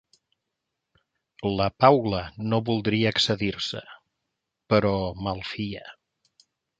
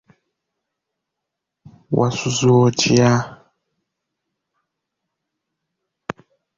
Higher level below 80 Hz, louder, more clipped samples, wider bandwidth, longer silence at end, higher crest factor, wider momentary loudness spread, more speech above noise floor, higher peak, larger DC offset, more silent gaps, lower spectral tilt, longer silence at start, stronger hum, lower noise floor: about the same, -52 dBFS vs -54 dBFS; second, -25 LUFS vs -17 LUFS; neither; first, 9.2 kHz vs 7.6 kHz; second, 0.85 s vs 3.25 s; about the same, 24 dB vs 20 dB; second, 13 LU vs 20 LU; second, 58 dB vs 66 dB; about the same, -2 dBFS vs -2 dBFS; neither; neither; about the same, -6 dB/octave vs -5.5 dB/octave; second, 1.4 s vs 1.9 s; neither; about the same, -83 dBFS vs -81 dBFS